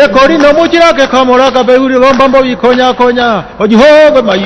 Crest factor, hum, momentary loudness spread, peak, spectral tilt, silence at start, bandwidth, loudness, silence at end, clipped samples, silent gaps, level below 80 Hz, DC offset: 6 dB; none; 5 LU; 0 dBFS; -5 dB/octave; 0 s; 11 kHz; -6 LUFS; 0 s; 9%; none; -34 dBFS; under 0.1%